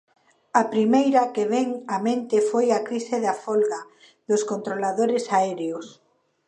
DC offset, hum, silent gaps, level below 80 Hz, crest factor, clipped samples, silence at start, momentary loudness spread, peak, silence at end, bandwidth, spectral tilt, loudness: under 0.1%; none; none; -78 dBFS; 18 dB; under 0.1%; 0.55 s; 7 LU; -6 dBFS; 0.55 s; 11 kHz; -5 dB/octave; -23 LUFS